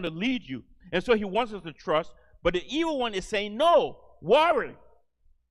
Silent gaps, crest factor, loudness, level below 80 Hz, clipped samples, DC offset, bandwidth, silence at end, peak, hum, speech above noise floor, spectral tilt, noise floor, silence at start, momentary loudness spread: none; 18 dB; -26 LUFS; -50 dBFS; under 0.1%; under 0.1%; 12 kHz; 0.75 s; -8 dBFS; none; 37 dB; -5 dB/octave; -63 dBFS; 0 s; 16 LU